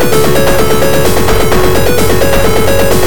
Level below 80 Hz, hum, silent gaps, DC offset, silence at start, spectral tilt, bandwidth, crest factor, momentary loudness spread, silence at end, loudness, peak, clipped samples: -20 dBFS; none; none; 30%; 0 s; -4.5 dB/octave; over 20 kHz; 8 dB; 1 LU; 0 s; -9 LUFS; 0 dBFS; 1%